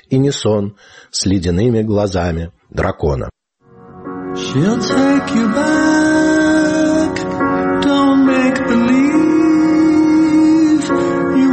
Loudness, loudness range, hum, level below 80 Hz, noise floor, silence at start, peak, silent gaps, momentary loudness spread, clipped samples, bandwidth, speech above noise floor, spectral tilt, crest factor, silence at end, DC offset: -14 LUFS; 6 LU; none; -38 dBFS; -46 dBFS; 0.1 s; -4 dBFS; none; 10 LU; under 0.1%; 8.8 kHz; 32 dB; -6 dB/octave; 10 dB; 0 s; under 0.1%